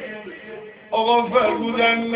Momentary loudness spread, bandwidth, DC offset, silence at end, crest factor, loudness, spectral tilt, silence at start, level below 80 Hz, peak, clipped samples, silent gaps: 19 LU; 4 kHz; under 0.1%; 0 s; 16 dB; -19 LUFS; -8 dB/octave; 0 s; -60 dBFS; -4 dBFS; under 0.1%; none